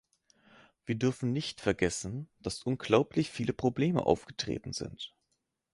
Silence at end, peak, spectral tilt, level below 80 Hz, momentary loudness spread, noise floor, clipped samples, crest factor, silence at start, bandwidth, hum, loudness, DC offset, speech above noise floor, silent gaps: 0.7 s; -10 dBFS; -5.5 dB/octave; -56 dBFS; 12 LU; -80 dBFS; under 0.1%; 24 dB; 0.85 s; 11.5 kHz; none; -32 LUFS; under 0.1%; 49 dB; none